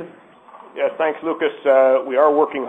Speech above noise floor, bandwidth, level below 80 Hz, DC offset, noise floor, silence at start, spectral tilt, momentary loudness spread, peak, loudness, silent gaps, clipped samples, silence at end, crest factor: 28 dB; 3.9 kHz; -72 dBFS; under 0.1%; -45 dBFS; 0 s; -6.5 dB/octave; 11 LU; -2 dBFS; -18 LUFS; none; under 0.1%; 0 s; 16 dB